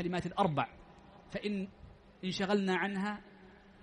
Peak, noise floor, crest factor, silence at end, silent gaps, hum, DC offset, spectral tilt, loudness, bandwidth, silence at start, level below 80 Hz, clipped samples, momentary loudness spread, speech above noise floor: -16 dBFS; -57 dBFS; 20 dB; 0.3 s; none; none; under 0.1%; -6 dB/octave; -35 LUFS; 10 kHz; 0 s; -64 dBFS; under 0.1%; 12 LU; 23 dB